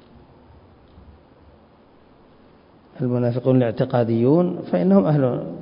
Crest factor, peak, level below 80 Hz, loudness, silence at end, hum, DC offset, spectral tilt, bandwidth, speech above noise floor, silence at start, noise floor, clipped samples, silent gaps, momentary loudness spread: 18 dB; -4 dBFS; -56 dBFS; -19 LUFS; 0 s; none; under 0.1%; -13.5 dB/octave; 5.4 kHz; 33 dB; 2.95 s; -52 dBFS; under 0.1%; none; 6 LU